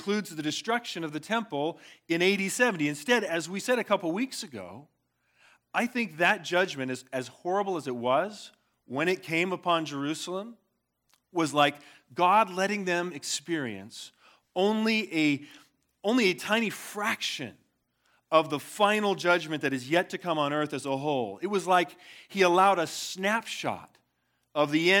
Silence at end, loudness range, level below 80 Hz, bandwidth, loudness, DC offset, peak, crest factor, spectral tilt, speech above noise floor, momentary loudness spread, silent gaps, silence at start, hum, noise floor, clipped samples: 0 s; 3 LU; -84 dBFS; 18.5 kHz; -28 LUFS; under 0.1%; -8 dBFS; 20 dB; -4 dB/octave; 49 dB; 12 LU; none; 0 s; none; -77 dBFS; under 0.1%